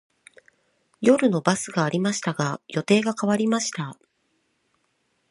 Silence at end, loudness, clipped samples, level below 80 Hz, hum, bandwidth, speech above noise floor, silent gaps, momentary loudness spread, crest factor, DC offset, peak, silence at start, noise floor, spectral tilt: 1.35 s; -23 LUFS; under 0.1%; -70 dBFS; none; 11.5 kHz; 48 dB; none; 9 LU; 22 dB; under 0.1%; -2 dBFS; 1 s; -71 dBFS; -5 dB/octave